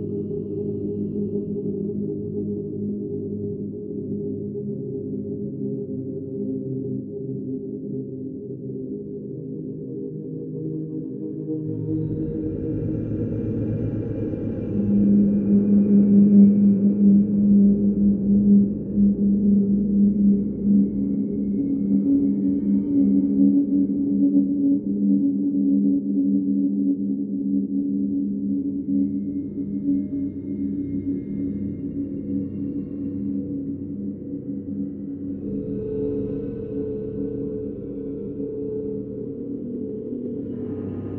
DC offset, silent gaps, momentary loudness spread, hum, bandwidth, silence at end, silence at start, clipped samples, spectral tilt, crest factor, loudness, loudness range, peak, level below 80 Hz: under 0.1%; none; 13 LU; none; 1.7 kHz; 0 s; 0 s; under 0.1%; -15 dB/octave; 18 dB; -23 LUFS; 13 LU; -6 dBFS; -48 dBFS